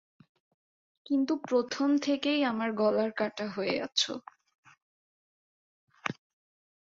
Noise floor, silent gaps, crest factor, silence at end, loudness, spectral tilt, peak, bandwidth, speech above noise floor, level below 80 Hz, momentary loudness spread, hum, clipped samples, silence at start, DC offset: under -90 dBFS; 4.55-4.63 s, 4.82-5.87 s; 20 dB; 0.8 s; -30 LUFS; -4 dB/octave; -12 dBFS; 7.8 kHz; over 61 dB; -76 dBFS; 10 LU; none; under 0.1%; 1.1 s; under 0.1%